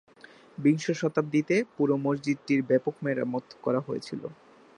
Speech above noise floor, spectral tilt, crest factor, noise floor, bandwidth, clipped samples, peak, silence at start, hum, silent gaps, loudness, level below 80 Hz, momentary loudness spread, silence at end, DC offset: 26 dB; -6.5 dB/octave; 16 dB; -53 dBFS; 10 kHz; under 0.1%; -12 dBFS; 0.6 s; none; none; -28 LUFS; -74 dBFS; 10 LU; 0.45 s; under 0.1%